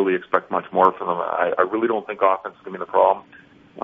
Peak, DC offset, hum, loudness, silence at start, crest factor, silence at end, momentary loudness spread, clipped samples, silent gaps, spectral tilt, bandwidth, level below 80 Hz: -2 dBFS; under 0.1%; none; -21 LUFS; 0 s; 20 dB; 0 s; 8 LU; under 0.1%; none; -4 dB/octave; 3.9 kHz; -66 dBFS